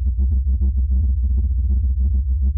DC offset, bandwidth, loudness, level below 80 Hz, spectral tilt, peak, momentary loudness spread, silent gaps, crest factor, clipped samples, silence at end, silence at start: under 0.1%; 0.6 kHz; -20 LUFS; -18 dBFS; -17.5 dB/octave; -12 dBFS; 1 LU; none; 6 dB; under 0.1%; 0 s; 0 s